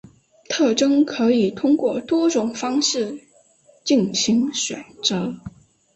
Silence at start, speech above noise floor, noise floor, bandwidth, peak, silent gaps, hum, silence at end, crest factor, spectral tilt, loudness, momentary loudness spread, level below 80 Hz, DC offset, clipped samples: 0.5 s; 35 dB; -55 dBFS; 8.4 kHz; -4 dBFS; none; none; 0.45 s; 18 dB; -3.5 dB/octave; -20 LUFS; 11 LU; -60 dBFS; under 0.1%; under 0.1%